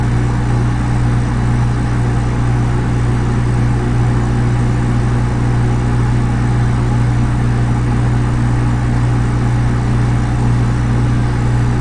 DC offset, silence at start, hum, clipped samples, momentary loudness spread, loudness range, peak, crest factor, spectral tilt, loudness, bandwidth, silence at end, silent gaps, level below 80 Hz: under 0.1%; 0 s; none; under 0.1%; 1 LU; 0 LU; -2 dBFS; 10 dB; -7.5 dB/octave; -15 LUFS; 9.8 kHz; 0 s; none; -20 dBFS